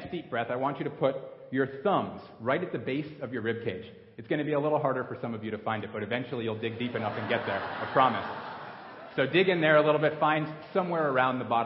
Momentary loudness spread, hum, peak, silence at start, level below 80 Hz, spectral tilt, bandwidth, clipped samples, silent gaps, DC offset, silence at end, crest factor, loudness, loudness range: 12 LU; none; -8 dBFS; 0 s; -66 dBFS; -10 dB/octave; 5.8 kHz; under 0.1%; none; under 0.1%; 0 s; 20 dB; -29 LUFS; 5 LU